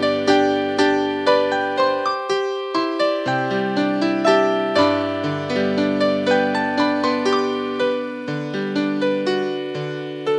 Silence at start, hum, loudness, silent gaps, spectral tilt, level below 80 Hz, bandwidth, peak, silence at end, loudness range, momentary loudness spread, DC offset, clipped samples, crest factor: 0 s; none; -20 LUFS; none; -5.5 dB/octave; -68 dBFS; 10.5 kHz; -2 dBFS; 0 s; 2 LU; 8 LU; under 0.1%; under 0.1%; 18 dB